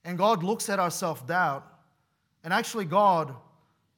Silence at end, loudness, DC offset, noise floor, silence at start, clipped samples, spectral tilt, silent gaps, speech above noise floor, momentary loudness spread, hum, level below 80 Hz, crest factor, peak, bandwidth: 0.6 s; -26 LUFS; under 0.1%; -73 dBFS; 0.05 s; under 0.1%; -4.5 dB/octave; none; 46 dB; 11 LU; none; -80 dBFS; 18 dB; -10 dBFS; 18 kHz